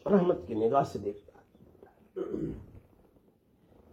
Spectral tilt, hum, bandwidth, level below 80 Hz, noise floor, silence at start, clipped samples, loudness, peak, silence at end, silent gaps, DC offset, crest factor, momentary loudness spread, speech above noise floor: -8.5 dB/octave; none; 12 kHz; -60 dBFS; -65 dBFS; 0.05 s; under 0.1%; -31 LUFS; -12 dBFS; 1.15 s; none; under 0.1%; 20 dB; 19 LU; 36 dB